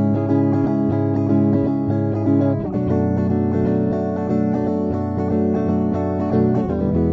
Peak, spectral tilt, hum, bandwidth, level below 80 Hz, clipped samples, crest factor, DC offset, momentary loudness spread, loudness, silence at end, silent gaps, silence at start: -6 dBFS; -11 dB/octave; none; 6 kHz; -42 dBFS; under 0.1%; 12 dB; under 0.1%; 3 LU; -19 LUFS; 0 s; none; 0 s